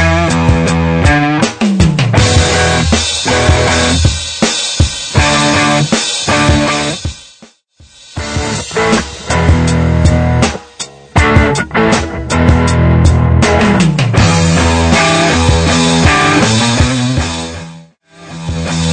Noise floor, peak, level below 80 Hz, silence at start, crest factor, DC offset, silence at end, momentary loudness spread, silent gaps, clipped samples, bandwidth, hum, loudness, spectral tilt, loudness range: -43 dBFS; 0 dBFS; -20 dBFS; 0 s; 10 dB; under 0.1%; 0 s; 9 LU; none; under 0.1%; 9.4 kHz; none; -10 LUFS; -4.5 dB/octave; 5 LU